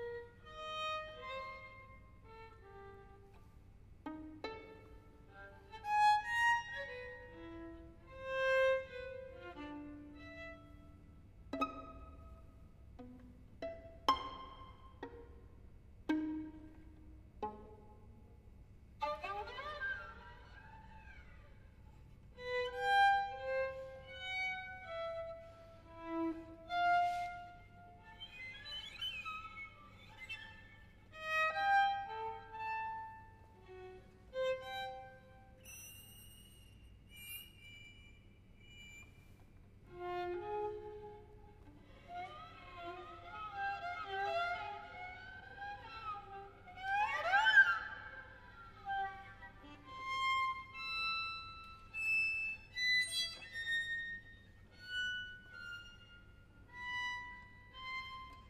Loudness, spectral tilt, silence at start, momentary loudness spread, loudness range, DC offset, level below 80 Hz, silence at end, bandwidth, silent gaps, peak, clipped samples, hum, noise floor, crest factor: -39 LUFS; -3 dB/octave; 0 s; 25 LU; 14 LU; under 0.1%; -62 dBFS; 0 s; 15.5 kHz; none; -16 dBFS; under 0.1%; none; -61 dBFS; 26 dB